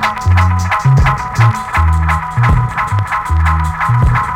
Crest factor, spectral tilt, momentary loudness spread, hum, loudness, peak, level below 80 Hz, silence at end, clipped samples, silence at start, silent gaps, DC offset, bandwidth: 10 dB; -6.5 dB/octave; 4 LU; none; -13 LUFS; -2 dBFS; -20 dBFS; 0 s; under 0.1%; 0 s; none; under 0.1%; 14 kHz